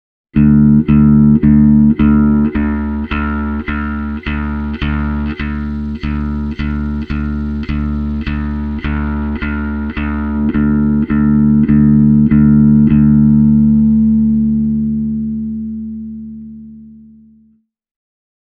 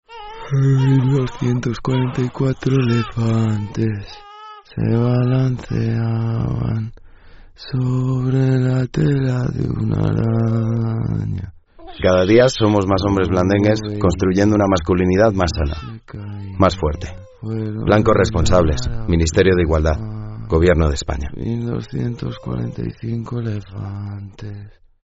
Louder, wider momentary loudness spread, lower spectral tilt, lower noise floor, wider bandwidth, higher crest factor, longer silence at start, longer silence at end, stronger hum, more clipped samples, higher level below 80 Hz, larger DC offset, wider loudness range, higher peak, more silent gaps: first, -13 LUFS vs -18 LUFS; second, 11 LU vs 16 LU; first, -11 dB/octave vs -7 dB/octave; first, -53 dBFS vs -42 dBFS; second, 4.7 kHz vs 8 kHz; about the same, 12 dB vs 16 dB; first, 0.35 s vs 0.1 s; first, 1.55 s vs 0.35 s; neither; neither; first, -24 dBFS vs -34 dBFS; neither; first, 10 LU vs 5 LU; about the same, 0 dBFS vs -2 dBFS; neither